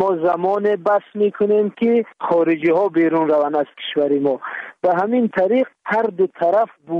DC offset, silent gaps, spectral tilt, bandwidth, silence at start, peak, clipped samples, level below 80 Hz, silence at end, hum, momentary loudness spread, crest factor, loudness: under 0.1%; none; -8 dB/octave; 5.8 kHz; 0 s; -6 dBFS; under 0.1%; -68 dBFS; 0 s; none; 5 LU; 12 dB; -18 LUFS